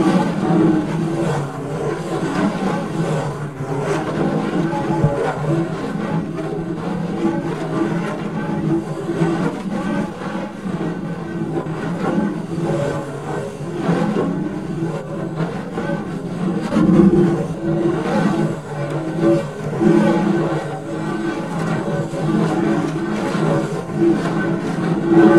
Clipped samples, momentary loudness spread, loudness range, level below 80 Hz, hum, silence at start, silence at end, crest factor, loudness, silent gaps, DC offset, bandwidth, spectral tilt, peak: under 0.1%; 9 LU; 5 LU; -46 dBFS; none; 0 s; 0 s; 18 dB; -20 LUFS; none; 0.4%; 12 kHz; -7.5 dB/octave; 0 dBFS